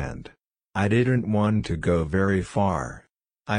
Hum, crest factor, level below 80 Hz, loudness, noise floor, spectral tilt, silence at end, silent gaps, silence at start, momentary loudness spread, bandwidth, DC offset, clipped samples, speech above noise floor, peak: none; 16 dB; -44 dBFS; -24 LUFS; -51 dBFS; -7.5 dB/octave; 0 s; none; 0 s; 13 LU; 10.5 kHz; under 0.1%; under 0.1%; 28 dB; -8 dBFS